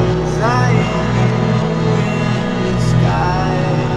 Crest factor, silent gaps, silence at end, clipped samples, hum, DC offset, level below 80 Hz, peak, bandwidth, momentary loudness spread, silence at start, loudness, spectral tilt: 14 dB; none; 0 s; under 0.1%; none; under 0.1%; -30 dBFS; -2 dBFS; 10 kHz; 3 LU; 0 s; -15 LUFS; -7 dB/octave